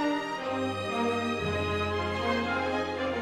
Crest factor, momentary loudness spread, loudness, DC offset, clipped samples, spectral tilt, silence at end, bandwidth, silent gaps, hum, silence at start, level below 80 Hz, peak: 14 dB; 3 LU; -30 LUFS; under 0.1%; under 0.1%; -5.5 dB/octave; 0 s; 14.5 kHz; none; none; 0 s; -54 dBFS; -16 dBFS